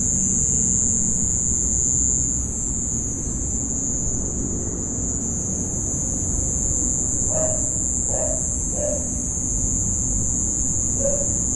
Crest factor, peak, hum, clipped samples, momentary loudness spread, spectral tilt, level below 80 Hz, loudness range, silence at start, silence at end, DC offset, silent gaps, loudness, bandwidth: 14 dB; -8 dBFS; none; under 0.1%; 6 LU; -5 dB/octave; -32 dBFS; 4 LU; 0 s; 0 s; under 0.1%; none; -20 LUFS; 11.5 kHz